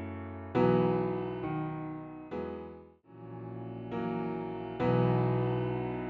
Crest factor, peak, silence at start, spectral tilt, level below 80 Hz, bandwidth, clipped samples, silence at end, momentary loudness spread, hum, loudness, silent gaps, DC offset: 20 dB; -14 dBFS; 0 s; -8 dB/octave; -58 dBFS; 4.9 kHz; under 0.1%; 0 s; 16 LU; none; -33 LUFS; none; under 0.1%